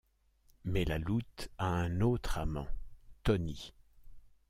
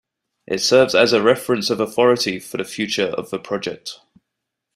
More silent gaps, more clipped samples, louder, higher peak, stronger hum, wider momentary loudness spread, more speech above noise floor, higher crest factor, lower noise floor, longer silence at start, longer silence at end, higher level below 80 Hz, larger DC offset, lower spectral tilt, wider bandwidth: neither; neither; second, -35 LUFS vs -18 LUFS; second, -18 dBFS vs -2 dBFS; neither; about the same, 15 LU vs 13 LU; second, 35 dB vs 61 dB; about the same, 18 dB vs 18 dB; second, -68 dBFS vs -80 dBFS; first, 0.65 s vs 0.5 s; second, 0.2 s vs 0.8 s; first, -44 dBFS vs -60 dBFS; neither; first, -7 dB/octave vs -3.5 dB/octave; about the same, 15.5 kHz vs 15.5 kHz